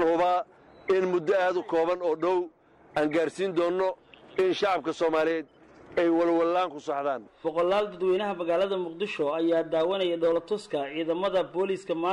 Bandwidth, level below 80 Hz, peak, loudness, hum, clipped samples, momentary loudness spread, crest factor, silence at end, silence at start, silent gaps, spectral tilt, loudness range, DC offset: 11 kHz; -66 dBFS; -16 dBFS; -27 LUFS; none; under 0.1%; 7 LU; 10 dB; 0 s; 0 s; none; -5.5 dB/octave; 1 LU; under 0.1%